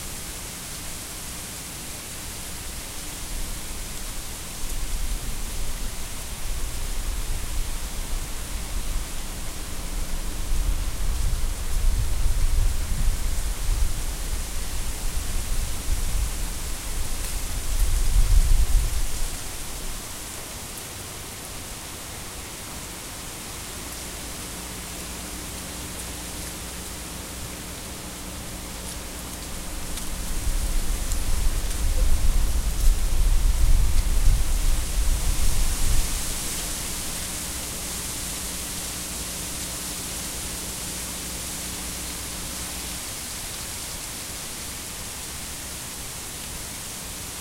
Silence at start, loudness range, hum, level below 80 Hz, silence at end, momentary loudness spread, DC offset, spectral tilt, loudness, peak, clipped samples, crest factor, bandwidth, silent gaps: 0 s; 7 LU; none; -26 dBFS; 0 s; 8 LU; under 0.1%; -3 dB/octave; -30 LUFS; -6 dBFS; under 0.1%; 20 dB; 16 kHz; none